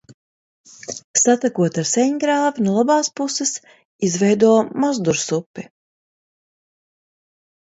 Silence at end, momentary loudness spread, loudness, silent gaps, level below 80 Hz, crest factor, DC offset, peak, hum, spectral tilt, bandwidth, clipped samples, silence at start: 2.1 s; 16 LU; -18 LUFS; 0.14-0.64 s, 1.04-1.14 s, 3.85-3.99 s, 5.46-5.54 s; -66 dBFS; 18 dB; under 0.1%; -2 dBFS; none; -4 dB/octave; 8.2 kHz; under 0.1%; 0.1 s